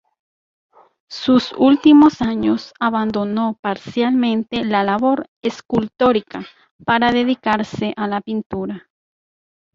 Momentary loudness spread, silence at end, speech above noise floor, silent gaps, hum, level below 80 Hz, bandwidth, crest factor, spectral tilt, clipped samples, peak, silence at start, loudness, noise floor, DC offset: 13 LU; 0.95 s; over 73 dB; 3.59-3.63 s, 5.28-5.41 s, 6.71-6.79 s, 8.46-8.50 s; none; -52 dBFS; 7.4 kHz; 16 dB; -6.5 dB/octave; under 0.1%; -2 dBFS; 1.1 s; -17 LUFS; under -90 dBFS; under 0.1%